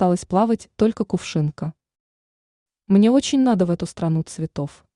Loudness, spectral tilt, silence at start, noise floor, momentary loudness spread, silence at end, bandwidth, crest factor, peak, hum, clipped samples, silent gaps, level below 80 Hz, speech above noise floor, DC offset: -20 LUFS; -6.5 dB/octave; 0 s; under -90 dBFS; 12 LU; 0.3 s; 11 kHz; 16 dB; -6 dBFS; none; under 0.1%; 2.00-2.66 s; -54 dBFS; over 70 dB; under 0.1%